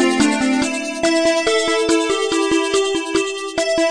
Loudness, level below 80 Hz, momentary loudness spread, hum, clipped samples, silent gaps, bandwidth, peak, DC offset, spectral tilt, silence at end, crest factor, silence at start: -17 LUFS; -48 dBFS; 5 LU; none; under 0.1%; none; 10.5 kHz; -4 dBFS; under 0.1%; -2.5 dB/octave; 0 s; 14 dB; 0 s